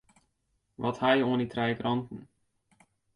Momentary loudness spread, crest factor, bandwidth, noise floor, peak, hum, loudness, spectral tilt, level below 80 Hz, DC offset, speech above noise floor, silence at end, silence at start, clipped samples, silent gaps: 13 LU; 20 dB; 10.5 kHz; -77 dBFS; -12 dBFS; none; -29 LUFS; -7 dB/octave; -66 dBFS; under 0.1%; 48 dB; 0.9 s; 0.8 s; under 0.1%; none